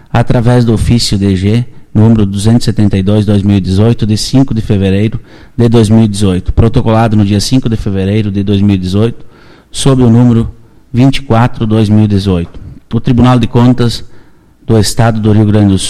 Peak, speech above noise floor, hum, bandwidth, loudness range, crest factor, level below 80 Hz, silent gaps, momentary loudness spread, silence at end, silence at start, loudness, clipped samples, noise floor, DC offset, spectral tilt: 0 dBFS; 30 dB; none; 13 kHz; 1 LU; 8 dB; -24 dBFS; none; 7 LU; 0 s; 0.15 s; -9 LUFS; under 0.1%; -38 dBFS; 0.6%; -7 dB/octave